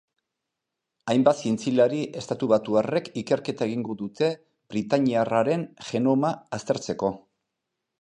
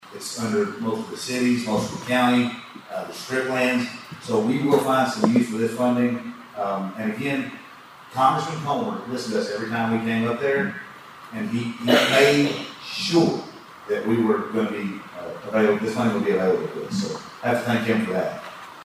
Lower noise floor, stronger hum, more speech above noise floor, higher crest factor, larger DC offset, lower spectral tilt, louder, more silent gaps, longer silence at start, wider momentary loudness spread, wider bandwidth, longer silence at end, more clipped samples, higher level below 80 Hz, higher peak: first, -84 dBFS vs -44 dBFS; neither; first, 60 dB vs 22 dB; about the same, 20 dB vs 20 dB; neither; about the same, -6 dB/octave vs -5 dB/octave; about the same, -25 LUFS vs -23 LUFS; neither; first, 1.05 s vs 0.05 s; second, 10 LU vs 14 LU; second, 10 kHz vs 15.5 kHz; first, 0.85 s vs 0 s; neither; about the same, -66 dBFS vs -64 dBFS; about the same, -6 dBFS vs -4 dBFS